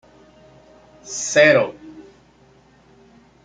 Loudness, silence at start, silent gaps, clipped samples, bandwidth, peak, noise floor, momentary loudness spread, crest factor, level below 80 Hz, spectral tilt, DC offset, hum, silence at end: -17 LUFS; 1.05 s; none; under 0.1%; 9.4 kHz; -2 dBFS; -53 dBFS; 19 LU; 22 dB; -62 dBFS; -3 dB/octave; under 0.1%; none; 1.45 s